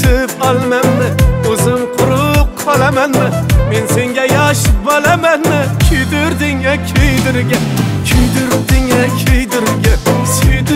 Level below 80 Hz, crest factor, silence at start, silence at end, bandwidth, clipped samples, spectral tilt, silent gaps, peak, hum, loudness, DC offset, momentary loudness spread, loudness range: -18 dBFS; 10 dB; 0 s; 0 s; 16.5 kHz; under 0.1%; -5 dB/octave; none; 0 dBFS; none; -12 LUFS; under 0.1%; 3 LU; 1 LU